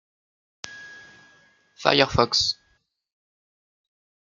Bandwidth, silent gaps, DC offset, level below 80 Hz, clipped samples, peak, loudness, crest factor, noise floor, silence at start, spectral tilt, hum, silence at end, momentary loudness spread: 12 kHz; none; under 0.1%; -52 dBFS; under 0.1%; -2 dBFS; -21 LUFS; 26 dB; -68 dBFS; 0.65 s; -3 dB/octave; none; 1.75 s; 22 LU